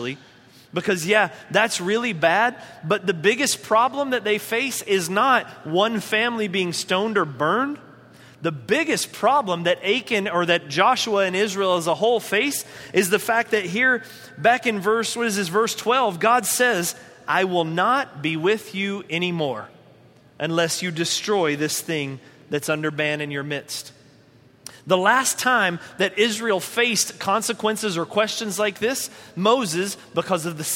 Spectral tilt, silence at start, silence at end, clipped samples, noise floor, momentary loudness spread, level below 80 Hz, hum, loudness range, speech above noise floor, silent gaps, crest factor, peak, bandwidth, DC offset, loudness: -3 dB/octave; 0 s; 0 s; under 0.1%; -53 dBFS; 9 LU; -68 dBFS; none; 4 LU; 31 dB; none; 20 dB; -2 dBFS; 16.5 kHz; under 0.1%; -21 LUFS